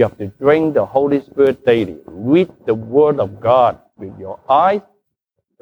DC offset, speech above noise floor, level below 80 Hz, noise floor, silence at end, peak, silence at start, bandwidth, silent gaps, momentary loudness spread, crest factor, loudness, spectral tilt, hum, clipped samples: under 0.1%; 58 dB; -54 dBFS; -74 dBFS; 0.8 s; -2 dBFS; 0 s; 5.8 kHz; none; 14 LU; 14 dB; -16 LUFS; -8.5 dB/octave; none; under 0.1%